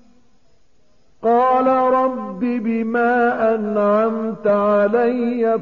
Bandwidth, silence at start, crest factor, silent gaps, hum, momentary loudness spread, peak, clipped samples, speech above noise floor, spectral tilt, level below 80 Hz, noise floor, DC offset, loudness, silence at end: 6.8 kHz; 1.2 s; 12 dB; none; none; 6 LU; -6 dBFS; under 0.1%; 43 dB; -5.5 dB/octave; -60 dBFS; -60 dBFS; 0.3%; -18 LUFS; 0 s